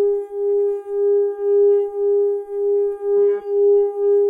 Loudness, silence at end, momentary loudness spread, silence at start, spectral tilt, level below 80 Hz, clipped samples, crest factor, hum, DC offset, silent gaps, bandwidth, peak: -18 LUFS; 0 s; 6 LU; 0 s; -7.5 dB/octave; -62 dBFS; under 0.1%; 8 dB; none; under 0.1%; none; 2.1 kHz; -10 dBFS